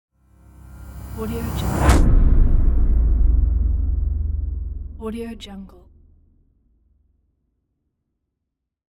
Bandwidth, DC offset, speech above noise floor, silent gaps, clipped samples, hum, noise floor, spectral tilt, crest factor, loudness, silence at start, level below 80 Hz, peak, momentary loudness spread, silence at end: 20 kHz; under 0.1%; 55 dB; none; under 0.1%; none; -80 dBFS; -7 dB/octave; 18 dB; -22 LUFS; 0.7 s; -20 dBFS; -2 dBFS; 20 LU; 3.25 s